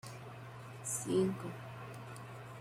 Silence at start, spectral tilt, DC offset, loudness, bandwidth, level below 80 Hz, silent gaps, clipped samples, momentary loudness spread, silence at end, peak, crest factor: 0.05 s; -5 dB/octave; under 0.1%; -40 LUFS; 16 kHz; -72 dBFS; none; under 0.1%; 16 LU; 0 s; -22 dBFS; 18 dB